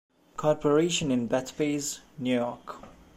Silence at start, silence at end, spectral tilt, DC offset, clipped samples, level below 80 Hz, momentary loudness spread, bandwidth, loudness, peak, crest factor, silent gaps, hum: 0.4 s; 0.25 s; -4.5 dB/octave; under 0.1%; under 0.1%; -60 dBFS; 19 LU; 15.5 kHz; -28 LUFS; -12 dBFS; 18 dB; none; none